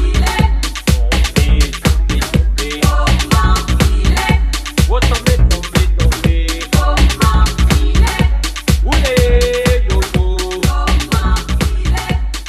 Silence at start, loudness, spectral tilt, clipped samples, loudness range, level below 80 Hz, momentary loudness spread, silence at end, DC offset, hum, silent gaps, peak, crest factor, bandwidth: 0 s; -14 LUFS; -5 dB/octave; under 0.1%; 1 LU; -14 dBFS; 4 LU; 0 s; under 0.1%; none; none; 0 dBFS; 12 dB; 14.5 kHz